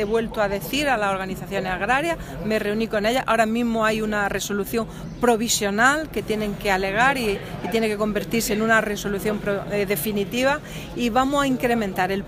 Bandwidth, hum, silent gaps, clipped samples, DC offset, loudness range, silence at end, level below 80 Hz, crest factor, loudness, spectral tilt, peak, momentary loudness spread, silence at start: 15.5 kHz; none; none; under 0.1%; under 0.1%; 2 LU; 0 s; -42 dBFS; 18 dB; -22 LUFS; -4 dB/octave; -4 dBFS; 7 LU; 0 s